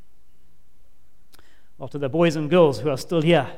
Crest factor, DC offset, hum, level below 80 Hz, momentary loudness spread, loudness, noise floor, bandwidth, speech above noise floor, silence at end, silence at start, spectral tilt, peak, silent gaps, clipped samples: 18 dB; 2%; none; -54 dBFS; 14 LU; -20 LUFS; -59 dBFS; 15 kHz; 39 dB; 0 s; 1.8 s; -6.5 dB/octave; -4 dBFS; none; under 0.1%